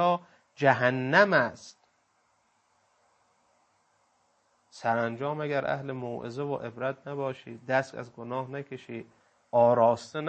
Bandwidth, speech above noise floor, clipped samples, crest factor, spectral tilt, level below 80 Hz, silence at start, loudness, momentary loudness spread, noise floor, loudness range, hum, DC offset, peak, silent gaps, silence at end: 8.6 kHz; 43 dB; under 0.1%; 24 dB; -6 dB/octave; -74 dBFS; 0 s; -28 LUFS; 18 LU; -70 dBFS; 8 LU; none; under 0.1%; -6 dBFS; none; 0 s